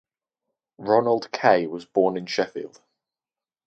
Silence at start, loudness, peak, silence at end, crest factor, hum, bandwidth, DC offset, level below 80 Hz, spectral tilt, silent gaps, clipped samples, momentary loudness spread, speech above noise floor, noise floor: 0.8 s; -23 LUFS; -4 dBFS; 1 s; 22 dB; none; 8.2 kHz; under 0.1%; -70 dBFS; -5.5 dB/octave; none; under 0.1%; 15 LU; over 68 dB; under -90 dBFS